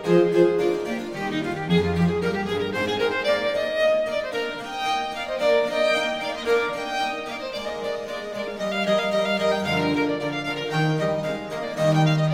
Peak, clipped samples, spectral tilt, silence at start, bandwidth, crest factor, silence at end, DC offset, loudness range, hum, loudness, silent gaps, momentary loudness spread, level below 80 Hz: -6 dBFS; under 0.1%; -6 dB/octave; 0 s; 16 kHz; 18 dB; 0 s; 0.2%; 2 LU; none; -24 LUFS; none; 9 LU; -54 dBFS